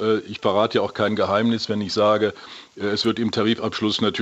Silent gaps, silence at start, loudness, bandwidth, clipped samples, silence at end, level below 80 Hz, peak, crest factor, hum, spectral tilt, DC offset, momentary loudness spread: none; 0 s; -21 LUFS; 8.2 kHz; under 0.1%; 0 s; -62 dBFS; -6 dBFS; 16 dB; none; -5.5 dB/octave; under 0.1%; 6 LU